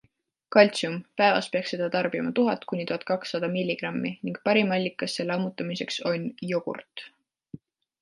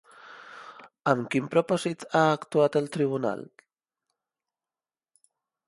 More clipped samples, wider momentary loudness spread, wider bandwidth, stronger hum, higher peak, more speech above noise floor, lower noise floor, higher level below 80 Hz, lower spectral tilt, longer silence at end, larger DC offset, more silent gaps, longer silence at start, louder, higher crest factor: neither; second, 9 LU vs 21 LU; about the same, 11.5 kHz vs 11.5 kHz; neither; about the same, -4 dBFS vs -6 dBFS; second, 43 dB vs over 64 dB; second, -69 dBFS vs under -90 dBFS; about the same, -74 dBFS vs -74 dBFS; about the same, -5.5 dB/octave vs -6 dB/octave; second, 0.45 s vs 2.25 s; neither; neither; first, 0.5 s vs 0.25 s; about the same, -26 LUFS vs -26 LUFS; about the same, 22 dB vs 24 dB